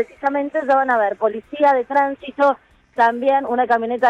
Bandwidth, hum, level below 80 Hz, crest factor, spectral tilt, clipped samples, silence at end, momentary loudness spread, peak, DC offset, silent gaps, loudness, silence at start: 8.6 kHz; none; -62 dBFS; 14 dB; -5.5 dB/octave; under 0.1%; 0 s; 7 LU; -4 dBFS; under 0.1%; none; -18 LUFS; 0 s